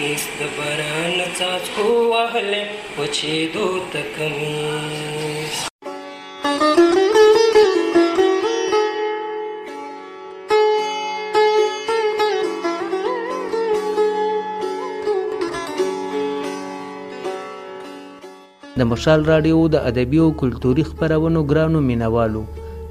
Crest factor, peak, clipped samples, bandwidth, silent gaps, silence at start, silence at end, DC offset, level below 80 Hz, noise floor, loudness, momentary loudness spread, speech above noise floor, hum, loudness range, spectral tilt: 18 dB; -2 dBFS; under 0.1%; 15.5 kHz; 5.70-5.79 s; 0 s; 0 s; under 0.1%; -40 dBFS; -41 dBFS; -19 LUFS; 16 LU; 22 dB; none; 8 LU; -5 dB/octave